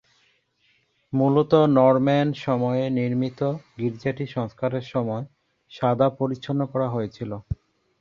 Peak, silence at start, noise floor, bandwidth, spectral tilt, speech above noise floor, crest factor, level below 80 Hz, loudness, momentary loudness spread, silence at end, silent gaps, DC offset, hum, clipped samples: -4 dBFS; 1.1 s; -66 dBFS; 7 kHz; -9 dB/octave; 43 dB; 20 dB; -50 dBFS; -23 LUFS; 14 LU; 0.45 s; none; under 0.1%; none; under 0.1%